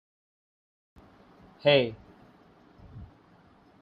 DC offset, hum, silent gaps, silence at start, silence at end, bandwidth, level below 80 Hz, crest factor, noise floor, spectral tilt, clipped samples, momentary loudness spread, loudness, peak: under 0.1%; none; none; 1.65 s; 0.75 s; 5.2 kHz; -62 dBFS; 24 dB; -59 dBFS; -7.5 dB/octave; under 0.1%; 27 LU; -25 LUFS; -10 dBFS